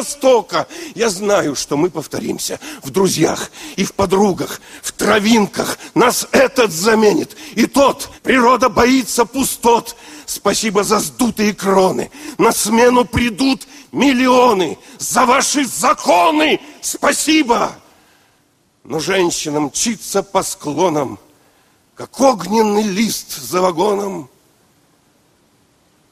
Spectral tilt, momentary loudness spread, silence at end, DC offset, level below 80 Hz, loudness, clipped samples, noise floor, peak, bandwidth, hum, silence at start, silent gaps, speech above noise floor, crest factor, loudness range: -3.5 dB/octave; 11 LU; 1.85 s; under 0.1%; -46 dBFS; -15 LUFS; under 0.1%; -58 dBFS; 0 dBFS; 15.5 kHz; none; 0 s; none; 43 dB; 16 dB; 5 LU